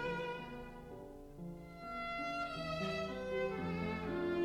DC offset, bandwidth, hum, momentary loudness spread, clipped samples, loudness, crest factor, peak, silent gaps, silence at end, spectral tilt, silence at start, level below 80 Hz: under 0.1%; 16.5 kHz; none; 12 LU; under 0.1%; -41 LUFS; 14 dB; -26 dBFS; none; 0 s; -6.5 dB/octave; 0 s; -60 dBFS